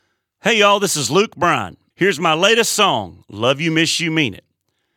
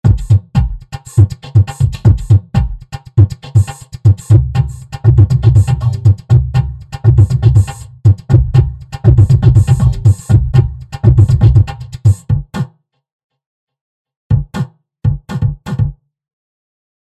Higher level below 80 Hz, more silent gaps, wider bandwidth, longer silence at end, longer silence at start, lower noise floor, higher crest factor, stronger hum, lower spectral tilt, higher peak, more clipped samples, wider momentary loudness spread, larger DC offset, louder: second, -58 dBFS vs -20 dBFS; second, none vs 13.12-13.30 s, 13.46-13.67 s, 13.81-14.05 s, 14.16-14.30 s; first, 18.5 kHz vs 9.4 kHz; second, 0.6 s vs 1.15 s; first, 0.45 s vs 0.05 s; first, -70 dBFS vs -36 dBFS; first, 16 dB vs 10 dB; neither; second, -3 dB/octave vs -8 dB/octave; about the same, -2 dBFS vs 0 dBFS; neither; about the same, 9 LU vs 11 LU; neither; second, -16 LUFS vs -12 LUFS